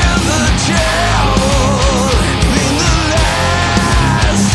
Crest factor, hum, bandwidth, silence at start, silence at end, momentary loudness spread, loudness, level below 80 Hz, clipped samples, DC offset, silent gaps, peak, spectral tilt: 10 dB; none; 12 kHz; 0 s; 0 s; 1 LU; -12 LUFS; -18 dBFS; under 0.1%; under 0.1%; none; 0 dBFS; -4 dB/octave